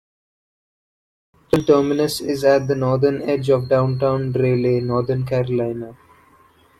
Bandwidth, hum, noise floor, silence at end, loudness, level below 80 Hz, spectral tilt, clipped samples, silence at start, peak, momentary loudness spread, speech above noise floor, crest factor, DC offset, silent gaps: 15 kHz; none; -53 dBFS; 0.85 s; -19 LUFS; -50 dBFS; -7 dB/octave; under 0.1%; 1.55 s; -2 dBFS; 6 LU; 35 dB; 18 dB; under 0.1%; none